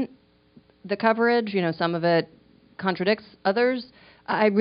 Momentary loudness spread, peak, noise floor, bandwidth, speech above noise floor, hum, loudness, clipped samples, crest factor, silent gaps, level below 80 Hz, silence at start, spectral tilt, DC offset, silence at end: 12 LU; -6 dBFS; -57 dBFS; 5.4 kHz; 34 dB; none; -24 LUFS; under 0.1%; 20 dB; none; -68 dBFS; 0 s; -4 dB/octave; under 0.1%; 0 s